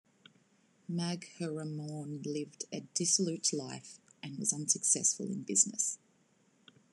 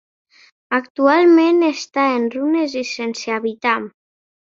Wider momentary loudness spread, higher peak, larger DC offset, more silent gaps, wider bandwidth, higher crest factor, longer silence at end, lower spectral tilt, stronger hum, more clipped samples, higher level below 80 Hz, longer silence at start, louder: first, 18 LU vs 11 LU; second, -14 dBFS vs -2 dBFS; neither; second, none vs 0.90-0.95 s; first, 12.5 kHz vs 7.6 kHz; first, 24 dB vs 16 dB; first, 0.95 s vs 0.7 s; about the same, -3 dB/octave vs -4 dB/octave; neither; neither; second, -86 dBFS vs -68 dBFS; first, 0.9 s vs 0.7 s; second, -33 LUFS vs -17 LUFS